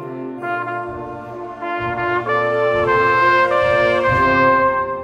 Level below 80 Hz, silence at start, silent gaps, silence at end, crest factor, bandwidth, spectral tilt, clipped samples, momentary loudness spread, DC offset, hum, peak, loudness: -44 dBFS; 0 s; none; 0 s; 14 dB; 10 kHz; -6.5 dB/octave; under 0.1%; 15 LU; under 0.1%; none; -2 dBFS; -16 LUFS